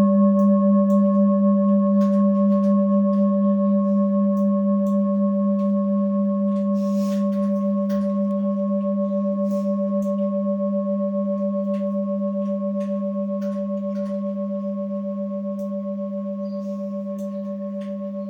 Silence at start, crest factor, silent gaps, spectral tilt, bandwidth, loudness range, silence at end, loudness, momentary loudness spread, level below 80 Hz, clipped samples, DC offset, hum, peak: 0 s; 12 dB; none; -11 dB/octave; 2.4 kHz; 9 LU; 0 s; -22 LUFS; 10 LU; -70 dBFS; under 0.1%; under 0.1%; none; -8 dBFS